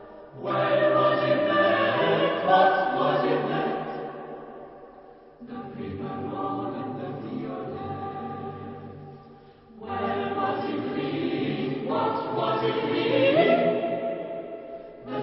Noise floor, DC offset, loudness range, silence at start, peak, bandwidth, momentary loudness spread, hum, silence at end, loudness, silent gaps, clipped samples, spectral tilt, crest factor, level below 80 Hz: -50 dBFS; under 0.1%; 13 LU; 0 s; -6 dBFS; 5.8 kHz; 19 LU; none; 0 s; -26 LUFS; none; under 0.1%; -10 dB/octave; 20 dB; -62 dBFS